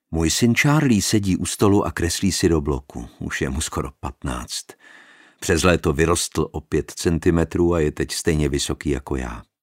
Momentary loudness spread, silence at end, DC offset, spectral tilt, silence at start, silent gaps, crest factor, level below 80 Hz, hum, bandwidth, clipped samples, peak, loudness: 12 LU; 0.2 s; under 0.1%; -5 dB/octave; 0.1 s; none; 20 dB; -34 dBFS; none; 16 kHz; under 0.1%; 0 dBFS; -21 LUFS